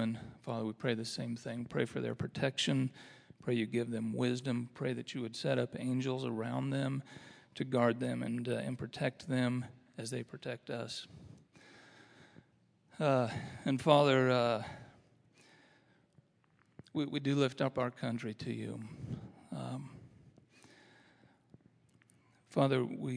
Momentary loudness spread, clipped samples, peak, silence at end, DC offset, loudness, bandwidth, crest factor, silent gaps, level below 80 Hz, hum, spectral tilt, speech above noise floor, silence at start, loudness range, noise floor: 14 LU; under 0.1%; -10 dBFS; 0 s; under 0.1%; -36 LUFS; 11 kHz; 26 dB; none; -74 dBFS; none; -6 dB/octave; 36 dB; 0 s; 12 LU; -71 dBFS